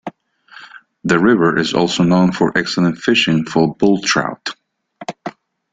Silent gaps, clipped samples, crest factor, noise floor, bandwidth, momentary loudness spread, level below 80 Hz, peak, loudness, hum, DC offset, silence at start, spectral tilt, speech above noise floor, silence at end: none; under 0.1%; 16 dB; -44 dBFS; 9.2 kHz; 17 LU; -52 dBFS; -2 dBFS; -15 LUFS; none; under 0.1%; 0.05 s; -5 dB/octave; 30 dB; 0.45 s